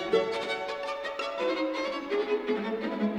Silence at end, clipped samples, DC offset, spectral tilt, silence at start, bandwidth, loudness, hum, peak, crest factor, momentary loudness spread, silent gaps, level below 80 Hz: 0 s; under 0.1%; under 0.1%; -5 dB/octave; 0 s; 11 kHz; -31 LUFS; none; -14 dBFS; 16 dB; 5 LU; none; -66 dBFS